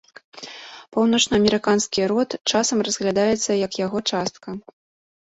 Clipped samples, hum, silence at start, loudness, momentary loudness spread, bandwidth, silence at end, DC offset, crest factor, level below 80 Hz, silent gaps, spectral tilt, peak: under 0.1%; none; 0.35 s; -21 LUFS; 18 LU; 8.2 kHz; 0.7 s; under 0.1%; 20 dB; -54 dBFS; 2.41-2.45 s; -3.5 dB/octave; -2 dBFS